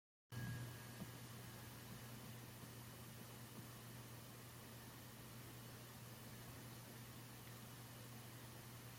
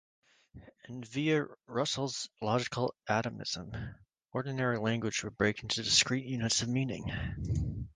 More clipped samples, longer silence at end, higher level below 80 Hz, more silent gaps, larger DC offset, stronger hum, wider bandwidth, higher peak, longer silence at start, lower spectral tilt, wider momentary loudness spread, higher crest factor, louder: neither; about the same, 0 s vs 0.05 s; second, -74 dBFS vs -50 dBFS; neither; neither; neither; first, 16.5 kHz vs 10 kHz; second, -38 dBFS vs -10 dBFS; second, 0.3 s vs 0.55 s; about the same, -4.5 dB/octave vs -4 dB/octave; second, 4 LU vs 11 LU; second, 18 dB vs 24 dB; second, -55 LUFS vs -33 LUFS